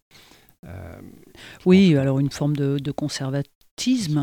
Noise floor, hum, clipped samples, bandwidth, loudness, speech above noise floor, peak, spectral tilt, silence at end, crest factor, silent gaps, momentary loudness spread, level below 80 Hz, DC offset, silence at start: -45 dBFS; none; under 0.1%; 14.5 kHz; -21 LUFS; 25 dB; -4 dBFS; -6.5 dB/octave; 0 s; 18 dB; 3.55-3.61 s, 3.71-3.77 s; 23 LU; -54 dBFS; under 0.1%; 0.65 s